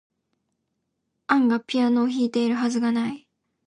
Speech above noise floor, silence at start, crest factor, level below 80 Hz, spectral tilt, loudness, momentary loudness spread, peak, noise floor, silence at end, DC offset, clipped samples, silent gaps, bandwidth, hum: 56 dB; 1.3 s; 18 dB; -74 dBFS; -5 dB/octave; -23 LUFS; 9 LU; -6 dBFS; -77 dBFS; 0.5 s; under 0.1%; under 0.1%; none; 10 kHz; none